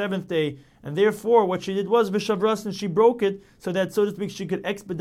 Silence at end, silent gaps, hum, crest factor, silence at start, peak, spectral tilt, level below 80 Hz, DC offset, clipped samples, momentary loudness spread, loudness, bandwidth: 0 s; none; none; 18 dB; 0 s; -6 dBFS; -6 dB/octave; -62 dBFS; under 0.1%; under 0.1%; 10 LU; -23 LUFS; 15 kHz